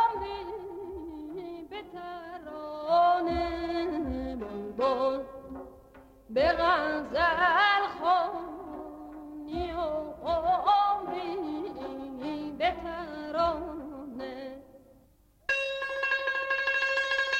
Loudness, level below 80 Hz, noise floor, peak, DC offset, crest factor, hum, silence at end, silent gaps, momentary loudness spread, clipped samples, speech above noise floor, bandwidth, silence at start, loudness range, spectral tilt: -29 LUFS; -52 dBFS; -62 dBFS; -14 dBFS; under 0.1%; 16 dB; none; 0 s; none; 17 LU; under 0.1%; 36 dB; 15 kHz; 0 s; 7 LU; -4.5 dB/octave